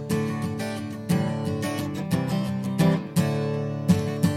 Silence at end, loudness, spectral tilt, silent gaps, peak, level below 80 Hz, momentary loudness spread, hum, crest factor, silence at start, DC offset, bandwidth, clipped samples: 0 s; -26 LUFS; -6.5 dB/octave; none; -8 dBFS; -54 dBFS; 7 LU; none; 18 dB; 0 s; under 0.1%; 16 kHz; under 0.1%